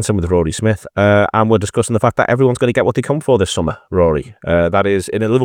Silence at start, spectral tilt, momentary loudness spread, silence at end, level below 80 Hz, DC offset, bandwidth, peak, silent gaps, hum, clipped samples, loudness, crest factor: 0 s; -6 dB/octave; 5 LU; 0 s; -40 dBFS; under 0.1%; 16 kHz; 0 dBFS; none; none; under 0.1%; -15 LUFS; 14 dB